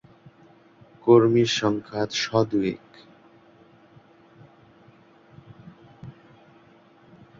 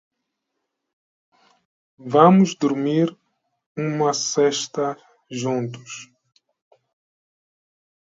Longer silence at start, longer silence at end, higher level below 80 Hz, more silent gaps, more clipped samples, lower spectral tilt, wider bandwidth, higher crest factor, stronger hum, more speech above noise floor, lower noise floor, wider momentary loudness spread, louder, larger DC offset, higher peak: second, 1.05 s vs 2 s; second, 1.3 s vs 2.1 s; first, -62 dBFS vs -72 dBFS; second, none vs 3.66-3.75 s; neither; about the same, -5.5 dB/octave vs -5.5 dB/octave; about the same, 7.6 kHz vs 7.8 kHz; about the same, 22 dB vs 22 dB; neither; second, 33 dB vs 59 dB; second, -54 dBFS vs -79 dBFS; first, 28 LU vs 23 LU; about the same, -22 LUFS vs -20 LUFS; neither; second, -4 dBFS vs 0 dBFS